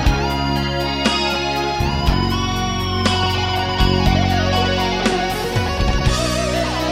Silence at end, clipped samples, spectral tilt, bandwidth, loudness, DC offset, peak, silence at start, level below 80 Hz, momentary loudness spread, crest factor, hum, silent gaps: 0 s; under 0.1%; -5 dB/octave; 16.5 kHz; -18 LUFS; under 0.1%; -2 dBFS; 0 s; -24 dBFS; 4 LU; 16 dB; none; none